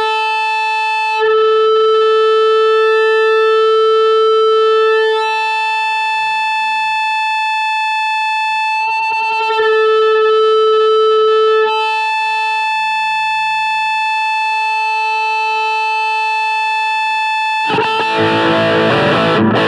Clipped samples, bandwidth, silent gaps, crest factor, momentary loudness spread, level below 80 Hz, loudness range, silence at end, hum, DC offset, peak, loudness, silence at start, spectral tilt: under 0.1%; 10 kHz; none; 12 dB; 4 LU; -58 dBFS; 3 LU; 0 s; none; under 0.1%; 0 dBFS; -13 LUFS; 0 s; -4.5 dB/octave